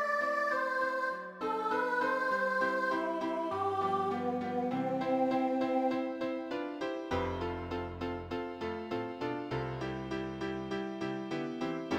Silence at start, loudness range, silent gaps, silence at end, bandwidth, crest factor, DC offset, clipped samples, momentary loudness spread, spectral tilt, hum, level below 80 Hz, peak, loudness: 0 s; 5 LU; none; 0 s; 15.5 kHz; 14 dB; under 0.1%; under 0.1%; 7 LU; -6.5 dB/octave; none; -60 dBFS; -20 dBFS; -34 LUFS